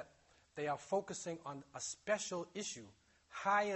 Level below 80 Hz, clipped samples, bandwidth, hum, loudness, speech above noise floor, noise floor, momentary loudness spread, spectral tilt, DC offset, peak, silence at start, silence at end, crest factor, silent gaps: -80 dBFS; under 0.1%; 8.4 kHz; none; -41 LUFS; 29 dB; -69 dBFS; 15 LU; -3 dB/octave; under 0.1%; -22 dBFS; 0 s; 0 s; 20 dB; none